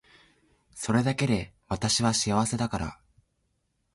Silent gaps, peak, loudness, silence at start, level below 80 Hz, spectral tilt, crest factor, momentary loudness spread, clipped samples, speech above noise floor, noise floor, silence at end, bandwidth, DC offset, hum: none; -12 dBFS; -27 LUFS; 0.75 s; -50 dBFS; -4.5 dB/octave; 18 dB; 11 LU; under 0.1%; 48 dB; -75 dBFS; 1 s; 11.5 kHz; under 0.1%; none